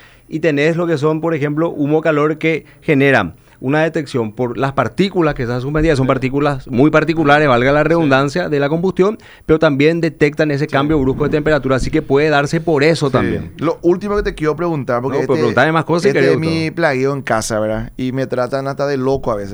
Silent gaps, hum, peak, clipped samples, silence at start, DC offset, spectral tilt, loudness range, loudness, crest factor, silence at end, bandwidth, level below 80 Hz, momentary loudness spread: none; none; 0 dBFS; under 0.1%; 0.3 s; under 0.1%; -6.5 dB/octave; 3 LU; -15 LUFS; 14 dB; 0 s; over 20 kHz; -36 dBFS; 7 LU